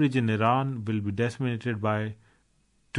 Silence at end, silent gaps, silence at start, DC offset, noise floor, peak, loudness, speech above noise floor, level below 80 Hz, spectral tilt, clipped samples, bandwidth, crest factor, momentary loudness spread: 0 s; none; 0 s; under 0.1%; -67 dBFS; -10 dBFS; -28 LUFS; 40 dB; -66 dBFS; -7.5 dB/octave; under 0.1%; 10.5 kHz; 18 dB; 6 LU